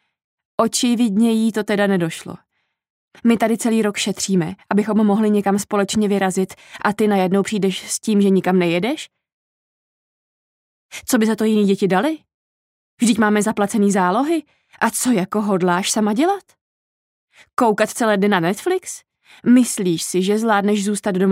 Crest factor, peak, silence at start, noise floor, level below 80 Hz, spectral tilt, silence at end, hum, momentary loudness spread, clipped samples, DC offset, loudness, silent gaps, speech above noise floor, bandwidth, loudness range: 16 dB; -4 dBFS; 0.6 s; under -90 dBFS; -62 dBFS; -5 dB/octave; 0 s; none; 8 LU; under 0.1%; under 0.1%; -18 LUFS; 2.90-3.08 s, 9.33-10.89 s, 12.34-12.97 s, 16.61-17.27 s, 17.53-17.57 s; over 72 dB; 16 kHz; 3 LU